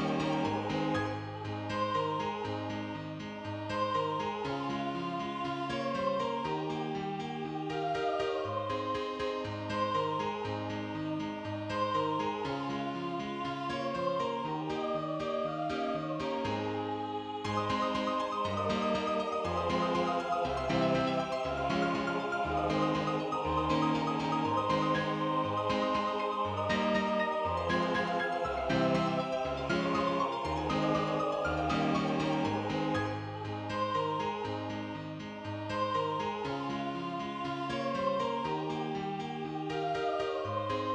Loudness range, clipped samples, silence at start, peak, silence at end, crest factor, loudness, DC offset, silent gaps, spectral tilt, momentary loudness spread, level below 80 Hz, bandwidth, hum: 4 LU; under 0.1%; 0 s; -16 dBFS; 0 s; 16 dB; -33 LUFS; under 0.1%; none; -6 dB/octave; 7 LU; -56 dBFS; 10 kHz; none